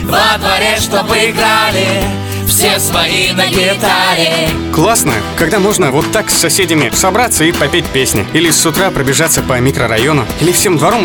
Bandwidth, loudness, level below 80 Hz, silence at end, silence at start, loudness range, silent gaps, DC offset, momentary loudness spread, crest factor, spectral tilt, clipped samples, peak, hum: over 20 kHz; -10 LUFS; -32 dBFS; 0 s; 0 s; 1 LU; none; 0.1%; 3 LU; 10 dB; -3 dB/octave; under 0.1%; 0 dBFS; none